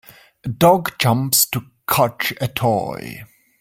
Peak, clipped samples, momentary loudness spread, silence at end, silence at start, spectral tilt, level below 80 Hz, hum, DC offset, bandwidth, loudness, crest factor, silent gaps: 0 dBFS; under 0.1%; 17 LU; 0.35 s; 0.45 s; -4 dB/octave; -52 dBFS; none; under 0.1%; 17 kHz; -18 LUFS; 18 dB; none